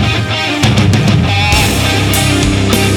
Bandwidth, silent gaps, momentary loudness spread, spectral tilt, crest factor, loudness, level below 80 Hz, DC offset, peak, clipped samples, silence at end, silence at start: 19.5 kHz; none; 3 LU; -4.5 dB/octave; 10 dB; -11 LUFS; -22 dBFS; under 0.1%; 0 dBFS; under 0.1%; 0 s; 0 s